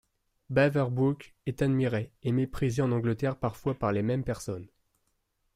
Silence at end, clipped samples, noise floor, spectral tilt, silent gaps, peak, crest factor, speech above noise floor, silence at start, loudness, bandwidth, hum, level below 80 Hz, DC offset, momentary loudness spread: 0.9 s; under 0.1%; -76 dBFS; -7.5 dB/octave; none; -12 dBFS; 16 dB; 47 dB; 0.5 s; -29 LUFS; 14.5 kHz; none; -54 dBFS; under 0.1%; 10 LU